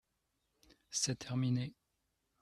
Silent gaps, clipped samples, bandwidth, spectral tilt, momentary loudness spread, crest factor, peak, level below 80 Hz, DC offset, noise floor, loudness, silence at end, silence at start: none; under 0.1%; 13.5 kHz; -4 dB/octave; 6 LU; 20 dB; -20 dBFS; -72 dBFS; under 0.1%; -83 dBFS; -37 LUFS; 0.7 s; 0.9 s